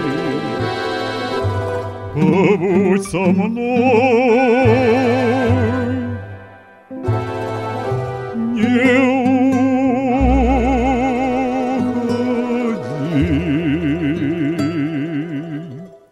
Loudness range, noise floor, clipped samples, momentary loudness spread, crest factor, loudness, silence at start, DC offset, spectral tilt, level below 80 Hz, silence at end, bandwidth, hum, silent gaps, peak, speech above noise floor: 5 LU; -41 dBFS; under 0.1%; 11 LU; 16 dB; -17 LUFS; 0 s; under 0.1%; -7.5 dB/octave; -32 dBFS; 0.15 s; 11.5 kHz; none; none; 0 dBFS; 27 dB